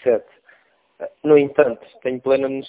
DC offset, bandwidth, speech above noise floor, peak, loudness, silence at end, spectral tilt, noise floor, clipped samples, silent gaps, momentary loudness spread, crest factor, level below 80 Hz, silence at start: under 0.1%; 4 kHz; 38 dB; -2 dBFS; -19 LUFS; 0 s; -10.5 dB/octave; -57 dBFS; under 0.1%; none; 15 LU; 18 dB; -62 dBFS; 0.05 s